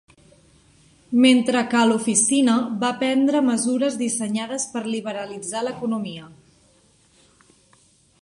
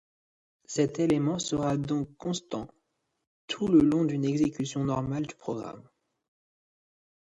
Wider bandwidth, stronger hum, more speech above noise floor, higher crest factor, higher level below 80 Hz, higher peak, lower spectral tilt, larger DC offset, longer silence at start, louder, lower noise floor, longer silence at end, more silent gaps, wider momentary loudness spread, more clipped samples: first, 11.5 kHz vs 9.6 kHz; neither; second, 37 dB vs 50 dB; about the same, 18 dB vs 20 dB; second, -66 dBFS vs -58 dBFS; first, -4 dBFS vs -10 dBFS; second, -3 dB/octave vs -6 dB/octave; neither; first, 1.1 s vs 0.7 s; first, -21 LUFS vs -29 LUFS; second, -58 dBFS vs -78 dBFS; first, 1.9 s vs 1.5 s; second, none vs 3.27-3.48 s; about the same, 12 LU vs 14 LU; neither